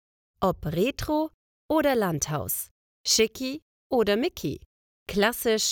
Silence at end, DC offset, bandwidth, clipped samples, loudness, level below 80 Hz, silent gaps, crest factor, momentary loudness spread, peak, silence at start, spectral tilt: 0 s; under 0.1%; over 20 kHz; under 0.1%; -26 LUFS; -50 dBFS; 1.34-1.69 s, 2.71-3.04 s, 3.62-3.90 s, 4.66-5.06 s; 20 dB; 12 LU; -8 dBFS; 0.4 s; -3.5 dB/octave